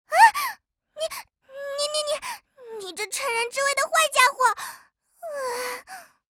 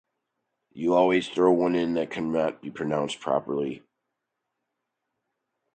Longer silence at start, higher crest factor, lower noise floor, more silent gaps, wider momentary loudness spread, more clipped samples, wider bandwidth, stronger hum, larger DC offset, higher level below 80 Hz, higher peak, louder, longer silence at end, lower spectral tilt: second, 0.1 s vs 0.75 s; about the same, 24 dB vs 20 dB; second, -53 dBFS vs -82 dBFS; neither; first, 23 LU vs 9 LU; neither; first, over 20 kHz vs 9 kHz; neither; neither; second, -72 dBFS vs -64 dBFS; first, -2 dBFS vs -8 dBFS; about the same, -23 LUFS vs -25 LUFS; second, 0.3 s vs 1.95 s; second, 1.5 dB/octave vs -6 dB/octave